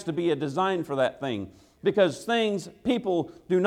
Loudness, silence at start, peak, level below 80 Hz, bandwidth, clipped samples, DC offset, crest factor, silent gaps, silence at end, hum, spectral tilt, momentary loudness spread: -27 LUFS; 0 s; -8 dBFS; -64 dBFS; 13.5 kHz; under 0.1%; under 0.1%; 18 dB; none; 0 s; none; -6 dB/octave; 8 LU